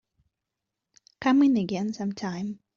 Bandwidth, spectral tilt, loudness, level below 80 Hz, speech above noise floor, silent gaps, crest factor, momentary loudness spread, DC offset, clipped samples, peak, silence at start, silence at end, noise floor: 7.2 kHz; -5.5 dB/octave; -26 LUFS; -68 dBFS; 61 dB; none; 14 dB; 11 LU; under 0.1%; under 0.1%; -12 dBFS; 1.2 s; 0.2 s; -86 dBFS